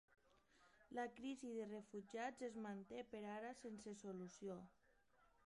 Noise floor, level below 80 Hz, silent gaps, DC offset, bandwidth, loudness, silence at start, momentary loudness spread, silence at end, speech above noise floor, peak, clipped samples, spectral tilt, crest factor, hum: -79 dBFS; -84 dBFS; none; under 0.1%; 11 kHz; -53 LUFS; 0.35 s; 5 LU; 0.2 s; 27 dB; -36 dBFS; under 0.1%; -5 dB/octave; 18 dB; none